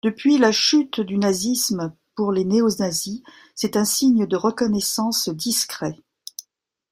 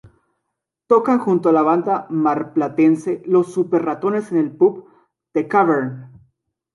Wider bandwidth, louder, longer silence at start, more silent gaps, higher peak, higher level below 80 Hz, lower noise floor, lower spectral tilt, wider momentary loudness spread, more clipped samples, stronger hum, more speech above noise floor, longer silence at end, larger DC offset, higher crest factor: first, 16 kHz vs 11.5 kHz; about the same, -20 LUFS vs -18 LUFS; second, 0.05 s vs 0.9 s; neither; about the same, -4 dBFS vs -2 dBFS; first, -60 dBFS vs -68 dBFS; second, -68 dBFS vs -79 dBFS; second, -3.5 dB/octave vs -8.5 dB/octave; first, 17 LU vs 6 LU; neither; neither; second, 47 dB vs 62 dB; second, 0.5 s vs 0.65 s; neither; about the same, 18 dB vs 16 dB